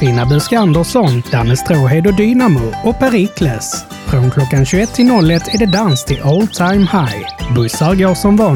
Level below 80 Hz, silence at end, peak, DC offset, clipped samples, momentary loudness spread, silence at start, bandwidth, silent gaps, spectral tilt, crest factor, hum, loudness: -30 dBFS; 0 s; 0 dBFS; under 0.1%; under 0.1%; 6 LU; 0 s; 18 kHz; none; -6 dB/octave; 10 dB; none; -12 LUFS